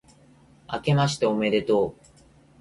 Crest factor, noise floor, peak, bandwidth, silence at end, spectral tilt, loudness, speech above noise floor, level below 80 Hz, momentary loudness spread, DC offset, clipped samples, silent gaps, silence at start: 16 dB; -55 dBFS; -10 dBFS; 11.5 kHz; 0.7 s; -6 dB/octave; -24 LUFS; 32 dB; -56 dBFS; 8 LU; under 0.1%; under 0.1%; none; 0.7 s